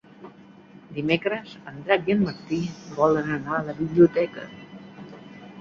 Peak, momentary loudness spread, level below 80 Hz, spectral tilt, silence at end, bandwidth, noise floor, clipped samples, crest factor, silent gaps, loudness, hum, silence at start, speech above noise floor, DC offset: -4 dBFS; 24 LU; -58 dBFS; -7 dB/octave; 0 s; 7.2 kHz; -48 dBFS; under 0.1%; 22 dB; none; -24 LUFS; none; 0.2 s; 25 dB; under 0.1%